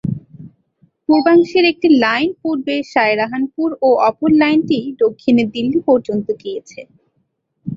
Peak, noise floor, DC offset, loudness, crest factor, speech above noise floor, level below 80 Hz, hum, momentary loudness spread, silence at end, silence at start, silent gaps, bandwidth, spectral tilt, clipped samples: -2 dBFS; -67 dBFS; under 0.1%; -15 LUFS; 14 dB; 52 dB; -56 dBFS; none; 12 LU; 0 s; 0.05 s; none; 7.4 kHz; -6.5 dB/octave; under 0.1%